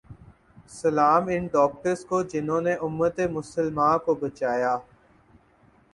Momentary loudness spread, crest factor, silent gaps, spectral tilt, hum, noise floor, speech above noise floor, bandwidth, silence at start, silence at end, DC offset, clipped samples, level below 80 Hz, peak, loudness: 8 LU; 18 dB; none; -6.5 dB/octave; none; -59 dBFS; 35 dB; 11.5 kHz; 0.1 s; 1.1 s; under 0.1%; under 0.1%; -58 dBFS; -8 dBFS; -25 LUFS